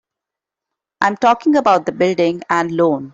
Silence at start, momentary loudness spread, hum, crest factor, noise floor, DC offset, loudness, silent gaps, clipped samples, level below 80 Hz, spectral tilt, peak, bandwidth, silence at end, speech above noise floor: 1 s; 5 LU; none; 14 dB; -85 dBFS; under 0.1%; -16 LUFS; none; under 0.1%; -60 dBFS; -6 dB/octave; -2 dBFS; 7.8 kHz; 0.05 s; 70 dB